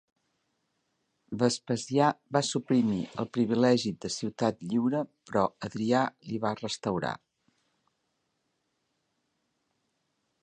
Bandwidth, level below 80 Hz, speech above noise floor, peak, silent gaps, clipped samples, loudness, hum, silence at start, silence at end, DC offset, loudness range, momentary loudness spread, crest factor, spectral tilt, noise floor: 10 kHz; -66 dBFS; 50 dB; -10 dBFS; none; under 0.1%; -29 LUFS; none; 1.3 s; 3.25 s; under 0.1%; 9 LU; 8 LU; 22 dB; -5.5 dB/octave; -78 dBFS